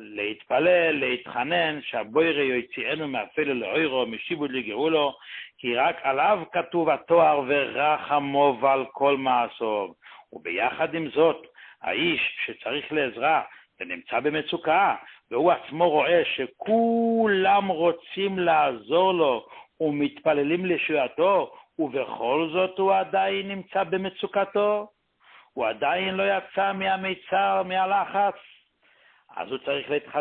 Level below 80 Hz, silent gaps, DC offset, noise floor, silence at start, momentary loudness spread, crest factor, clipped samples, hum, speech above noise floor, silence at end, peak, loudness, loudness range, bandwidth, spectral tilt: -68 dBFS; none; under 0.1%; -61 dBFS; 0 s; 9 LU; 18 dB; under 0.1%; none; 37 dB; 0 s; -8 dBFS; -24 LUFS; 4 LU; 4.4 kHz; -9.5 dB/octave